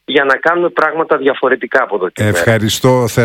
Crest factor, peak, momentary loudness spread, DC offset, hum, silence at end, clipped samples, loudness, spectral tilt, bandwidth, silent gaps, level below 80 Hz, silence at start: 12 dB; 0 dBFS; 3 LU; under 0.1%; none; 0 s; 0.3%; -13 LUFS; -5 dB/octave; 17 kHz; none; -48 dBFS; 0.1 s